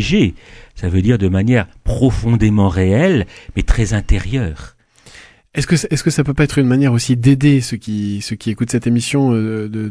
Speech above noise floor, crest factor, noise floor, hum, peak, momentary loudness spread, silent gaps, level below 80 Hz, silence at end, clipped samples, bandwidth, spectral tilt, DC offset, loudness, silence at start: 28 dB; 14 dB; -43 dBFS; none; 0 dBFS; 9 LU; none; -26 dBFS; 0 s; under 0.1%; 11 kHz; -6.5 dB/octave; under 0.1%; -16 LUFS; 0 s